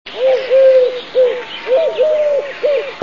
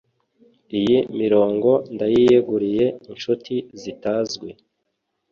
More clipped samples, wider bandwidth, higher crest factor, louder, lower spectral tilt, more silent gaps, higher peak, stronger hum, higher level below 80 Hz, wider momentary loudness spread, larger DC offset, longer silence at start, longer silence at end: neither; about the same, 7 kHz vs 7.2 kHz; second, 10 dB vs 16 dB; first, -14 LUFS vs -20 LUFS; second, -3.5 dB/octave vs -6.5 dB/octave; neither; about the same, -2 dBFS vs -4 dBFS; neither; about the same, -60 dBFS vs -58 dBFS; second, 7 LU vs 13 LU; first, 0.6% vs under 0.1%; second, 0.05 s vs 0.7 s; second, 0 s vs 0.8 s